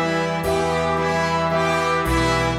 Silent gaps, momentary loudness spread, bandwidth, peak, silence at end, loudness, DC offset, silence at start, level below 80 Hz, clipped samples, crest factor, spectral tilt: none; 2 LU; 16 kHz; -8 dBFS; 0 s; -20 LUFS; under 0.1%; 0 s; -34 dBFS; under 0.1%; 12 dB; -5 dB/octave